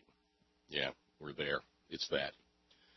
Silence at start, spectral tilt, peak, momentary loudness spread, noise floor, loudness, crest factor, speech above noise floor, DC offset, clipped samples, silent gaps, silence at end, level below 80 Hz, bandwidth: 0.7 s; -1 dB/octave; -20 dBFS; 12 LU; -76 dBFS; -40 LUFS; 24 dB; 36 dB; under 0.1%; under 0.1%; none; 0.65 s; -70 dBFS; 6 kHz